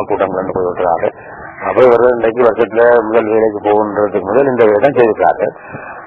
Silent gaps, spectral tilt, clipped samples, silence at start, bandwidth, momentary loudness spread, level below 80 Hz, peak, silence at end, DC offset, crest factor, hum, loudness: none; -8.5 dB/octave; under 0.1%; 0 s; 4.3 kHz; 11 LU; -48 dBFS; 0 dBFS; 0 s; under 0.1%; 12 dB; none; -12 LUFS